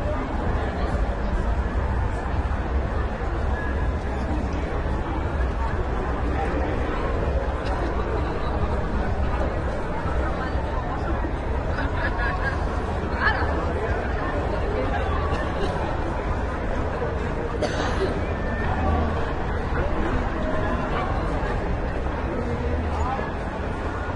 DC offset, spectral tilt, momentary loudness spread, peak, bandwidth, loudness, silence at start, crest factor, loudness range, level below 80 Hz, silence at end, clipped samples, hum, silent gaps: under 0.1%; -7.5 dB/octave; 3 LU; -8 dBFS; 10 kHz; -26 LUFS; 0 s; 16 dB; 2 LU; -28 dBFS; 0 s; under 0.1%; none; none